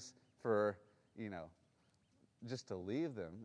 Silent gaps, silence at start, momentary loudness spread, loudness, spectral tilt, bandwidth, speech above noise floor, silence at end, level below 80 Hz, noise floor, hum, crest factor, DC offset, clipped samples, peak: none; 0 s; 20 LU; -43 LUFS; -6 dB/octave; 10 kHz; 34 dB; 0 s; -80 dBFS; -76 dBFS; none; 20 dB; under 0.1%; under 0.1%; -24 dBFS